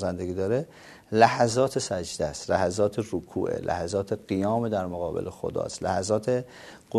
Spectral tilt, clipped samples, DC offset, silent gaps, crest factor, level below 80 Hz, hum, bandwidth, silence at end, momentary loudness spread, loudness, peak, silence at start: -5 dB/octave; under 0.1%; under 0.1%; none; 24 dB; -58 dBFS; none; 13.5 kHz; 0 s; 10 LU; -27 LUFS; -4 dBFS; 0 s